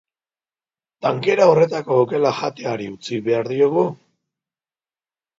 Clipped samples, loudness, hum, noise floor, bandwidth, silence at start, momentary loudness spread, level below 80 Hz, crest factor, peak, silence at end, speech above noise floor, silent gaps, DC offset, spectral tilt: under 0.1%; -19 LUFS; none; under -90 dBFS; 7.8 kHz; 1 s; 12 LU; -66 dBFS; 20 dB; 0 dBFS; 1.45 s; over 72 dB; none; under 0.1%; -6.5 dB/octave